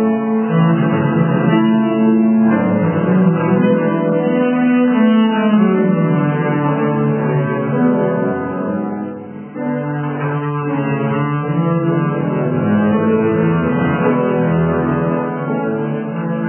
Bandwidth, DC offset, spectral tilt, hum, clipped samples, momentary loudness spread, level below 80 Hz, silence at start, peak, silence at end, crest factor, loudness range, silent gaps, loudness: 3.3 kHz; under 0.1%; -12.5 dB/octave; none; under 0.1%; 7 LU; -46 dBFS; 0 s; -2 dBFS; 0 s; 14 dB; 5 LU; none; -15 LUFS